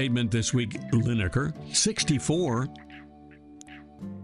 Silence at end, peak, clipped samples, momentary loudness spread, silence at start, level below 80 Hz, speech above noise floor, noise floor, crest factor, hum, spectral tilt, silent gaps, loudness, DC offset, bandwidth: 0 s; -10 dBFS; under 0.1%; 22 LU; 0 s; -50 dBFS; 23 dB; -50 dBFS; 16 dB; none; -4.5 dB/octave; none; -26 LUFS; under 0.1%; 11.5 kHz